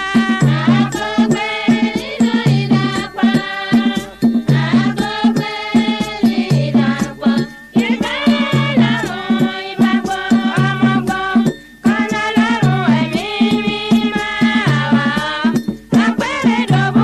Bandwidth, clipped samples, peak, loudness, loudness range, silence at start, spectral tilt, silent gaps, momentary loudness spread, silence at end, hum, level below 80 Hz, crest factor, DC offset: 12.5 kHz; under 0.1%; 0 dBFS; -15 LUFS; 1 LU; 0 s; -6 dB/octave; none; 4 LU; 0 s; none; -46 dBFS; 14 dB; under 0.1%